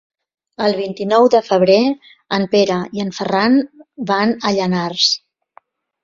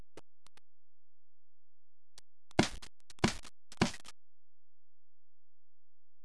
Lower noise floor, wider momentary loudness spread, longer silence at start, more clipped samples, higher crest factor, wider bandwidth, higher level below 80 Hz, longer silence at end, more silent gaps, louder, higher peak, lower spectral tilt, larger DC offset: second, -51 dBFS vs under -90 dBFS; second, 10 LU vs 22 LU; first, 0.6 s vs 0.15 s; neither; second, 16 dB vs 34 dB; second, 7.6 kHz vs 11 kHz; about the same, -60 dBFS vs -58 dBFS; second, 0.85 s vs 2.15 s; neither; first, -16 LUFS vs -36 LUFS; first, -2 dBFS vs -8 dBFS; about the same, -5 dB/octave vs -4.5 dB/octave; neither